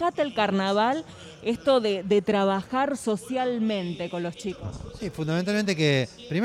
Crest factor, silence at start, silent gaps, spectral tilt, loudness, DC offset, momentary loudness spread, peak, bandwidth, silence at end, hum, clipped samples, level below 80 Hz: 16 dB; 0 s; none; -5.5 dB/octave; -26 LUFS; under 0.1%; 11 LU; -10 dBFS; 13 kHz; 0 s; none; under 0.1%; -54 dBFS